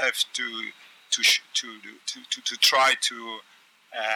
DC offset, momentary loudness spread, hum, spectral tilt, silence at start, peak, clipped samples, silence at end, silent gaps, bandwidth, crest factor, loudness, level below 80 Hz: under 0.1%; 19 LU; none; 2 dB/octave; 0 s; -8 dBFS; under 0.1%; 0 s; none; 19 kHz; 18 dB; -23 LUFS; under -90 dBFS